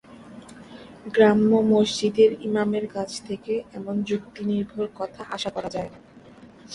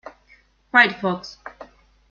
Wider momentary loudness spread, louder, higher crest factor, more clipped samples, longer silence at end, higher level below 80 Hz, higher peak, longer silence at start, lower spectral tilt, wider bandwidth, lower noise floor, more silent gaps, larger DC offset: about the same, 23 LU vs 24 LU; second, -24 LUFS vs -19 LUFS; about the same, 20 dB vs 22 dB; neither; second, 0 s vs 0.45 s; about the same, -60 dBFS vs -60 dBFS; about the same, -4 dBFS vs -2 dBFS; about the same, 0.1 s vs 0.05 s; about the same, -5.5 dB/octave vs -5 dB/octave; first, 11.5 kHz vs 7.2 kHz; second, -48 dBFS vs -56 dBFS; neither; neither